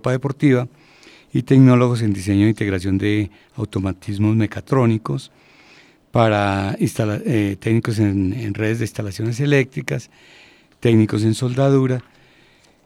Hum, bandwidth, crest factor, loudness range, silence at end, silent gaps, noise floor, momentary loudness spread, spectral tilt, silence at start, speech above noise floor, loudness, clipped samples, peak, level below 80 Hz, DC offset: none; 13.5 kHz; 18 dB; 4 LU; 0.85 s; none; -53 dBFS; 10 LU; -7.5 dB/octave; 0.05 s; 35 dB; -19 LUFS; under 0.1%; 0 dBFS; -52 dBFS; under 0.1%